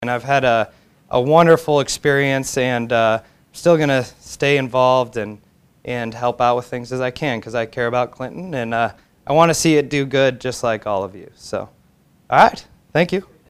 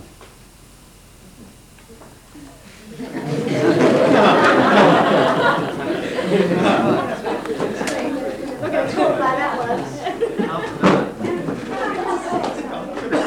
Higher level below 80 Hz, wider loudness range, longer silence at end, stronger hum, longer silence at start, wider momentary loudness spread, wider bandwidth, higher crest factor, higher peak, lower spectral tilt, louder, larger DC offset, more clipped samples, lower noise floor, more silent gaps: about the same, -52 dBFS vs -50 dBFS; about the same, 5 LU vs 7 LU; first, 0.25 s vs 0 s; neither; about the same, 0 s vs 0 s; about the same, 15 LU vs 13 LU; second, 15.5 kHz vs 17.5 kHz; about the same, 18 dB vs 18 dB; about the same, 0 dBFS vs 0 dBFS; about the same, -5 dB/octave vs -5.5 dB/octave; about the same, -18 LUFS vs -18 LUFS; neither; neither; first, -55 dBFS vs -45 dBFS; neither